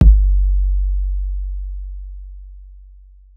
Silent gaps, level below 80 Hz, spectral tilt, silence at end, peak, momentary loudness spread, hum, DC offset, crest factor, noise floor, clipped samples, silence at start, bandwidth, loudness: none; -16 dBFS; -11 dB/octave; 0.65 s; 0 dBFS; 22 LU; none; under 0.1%; 16 dB; -43 dBFS; under 0.1%; 0 s; 0.9 kHz; -20 LUFS